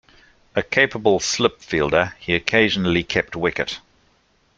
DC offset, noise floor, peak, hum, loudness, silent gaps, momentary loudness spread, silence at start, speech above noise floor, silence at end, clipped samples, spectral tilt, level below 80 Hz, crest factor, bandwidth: under 0.1%; -61 dBFS; -2 dBFS; none; -20 LUFS; none; 9 LU; 0.55 s; 41 dB; 0.8 s; under 0.1%; -4 dB/octave; -48 dBFS; 20 dB; 9.2 kHz